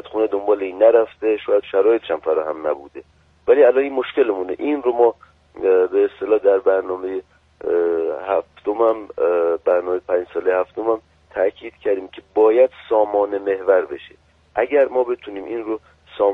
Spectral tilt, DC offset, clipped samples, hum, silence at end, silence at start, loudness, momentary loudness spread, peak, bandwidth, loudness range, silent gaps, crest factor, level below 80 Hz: -7 dB/octave; under 0.1%; under 0.1%; none; 0 s; 0.05 s; -19 LUFS; 12 LU; -2 dBFS; 4 kHz; 3 LU; none; 18 dB; -58 dBFS